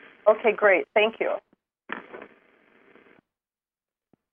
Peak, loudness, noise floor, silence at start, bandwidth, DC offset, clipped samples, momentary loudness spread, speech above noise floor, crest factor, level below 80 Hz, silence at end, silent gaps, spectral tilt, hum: -4 dBFS; -22 LUFS; under -90 dBFS; 0.25 s; 3.6 kHz; under 0.1%; under 0.1%; 19 LU; over 68 dB; 22 dB; -80 dBFS; 2.1 s; none; -7 dB/octave; none